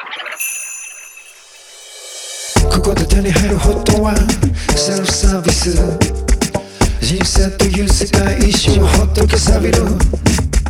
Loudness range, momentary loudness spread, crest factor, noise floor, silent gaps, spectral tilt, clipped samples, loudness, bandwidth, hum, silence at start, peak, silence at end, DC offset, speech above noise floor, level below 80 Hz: 4 LU; 13 LU; 12 dB; -39 dBFS; none; -4.5 dB/octave; under 0.1%; -14 LUFS; 19 kHz; none; 0 s; 0 dBFS; 0 s; under 0.1%; 27 dB; -16 dBFS